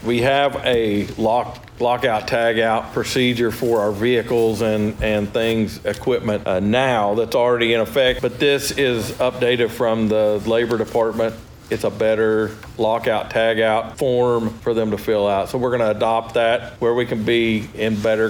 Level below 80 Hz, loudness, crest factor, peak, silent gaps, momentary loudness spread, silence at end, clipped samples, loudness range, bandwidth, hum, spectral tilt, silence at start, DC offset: -44 dBFS; -19 LUFS; 14 dB; -4 dBFS; none; 5 LU; 0 s; under 0.1%; 2 LU; over 20 kHz; none; -5.5 dB/octave; 0 s; under 0.1%